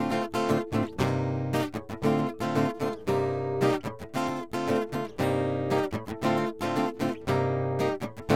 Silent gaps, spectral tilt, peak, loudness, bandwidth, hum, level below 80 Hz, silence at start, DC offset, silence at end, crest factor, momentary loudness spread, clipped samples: none; -6.5 dB/octave; -8 dBFS; -29 LUFS; 16.5 kHz; none; -56 dBFS; 0 s; 0.3%; 0 s; 18 dB; 5 LU; under 0.1%